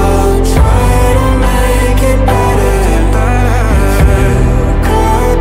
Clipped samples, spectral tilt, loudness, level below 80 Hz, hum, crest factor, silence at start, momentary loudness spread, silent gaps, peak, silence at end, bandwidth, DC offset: under 0.1%; -6 dB/octave; -10 LUFS; -10 dBFS; none; 8 dB; 0 s; 2 LU; none; 0 dBFS; 0 s; 16 kHz; under 0.1%